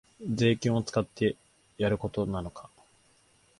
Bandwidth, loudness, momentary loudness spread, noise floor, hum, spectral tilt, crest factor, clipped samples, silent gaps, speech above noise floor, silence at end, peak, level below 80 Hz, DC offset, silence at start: 11.5 kHz; -29 LUFS; 14 LU; -64 dBFS; none; -6.5 dB/octave; 20 dB; under 0.1%; none; 36 dB; 1 s; -12 dBFS; -54 dBFS; under 0.1%; 0.2 s